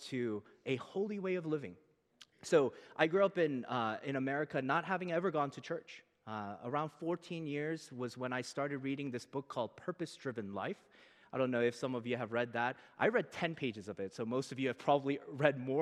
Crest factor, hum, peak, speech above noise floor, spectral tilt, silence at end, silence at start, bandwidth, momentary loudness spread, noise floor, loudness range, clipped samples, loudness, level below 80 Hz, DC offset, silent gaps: 24 dB; none; -14 dBFS; 28 dB; -6 dB/octave; 0 s; 0 s; 12.5 kHz; 11 LU; -65 dBFS; 6 LU; under 0.1%; -37 LUFS; -86 dBFS; under 0.1%; none